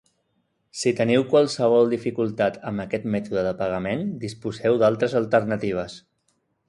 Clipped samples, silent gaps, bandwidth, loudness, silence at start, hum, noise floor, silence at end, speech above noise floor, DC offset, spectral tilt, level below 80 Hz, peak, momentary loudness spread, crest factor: under 0.1%; none; 11.5 kHz; -23 LUFS; 0.75 s; none; -71 dBFS; 0.7 s; 49 dB; under 0.1%; -6 dB/octave; -58 dBFS; -6 dBFS; 11 LU; 18 dB